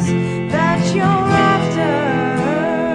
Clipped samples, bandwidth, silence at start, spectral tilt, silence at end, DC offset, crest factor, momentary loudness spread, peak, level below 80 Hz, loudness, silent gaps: under 0.1%; 10 kHz; 0 s; -6.5 dB/octave; 0 s; under 0.1%; 14 dB; 4 LU; -2 dBFS; -44 dBFS; -16 LUFS; none